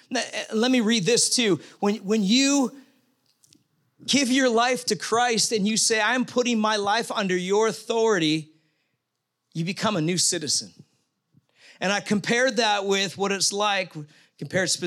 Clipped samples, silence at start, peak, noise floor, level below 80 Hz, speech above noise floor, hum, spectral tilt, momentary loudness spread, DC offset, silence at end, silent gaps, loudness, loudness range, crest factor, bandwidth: under 0.1%; 0.1 s; -8 dBFS; -80 dBFS; -74 dBFS; 57 dB; none; -3 dB/octave; 8 LU; under 0.1%; 0 s; none; -23 LUFS; 4 LU; 16 dB; 15.5 kHz